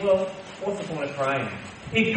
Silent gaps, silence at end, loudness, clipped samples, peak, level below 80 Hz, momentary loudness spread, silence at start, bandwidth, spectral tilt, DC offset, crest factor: none; 0 s; -28 LUFS; under 0.1%; -8 dBFS; -58 dBFS; 9 LU; 0 s; 8.8 kHz; -5.5 dB/octave; under 0.1%; 18 dB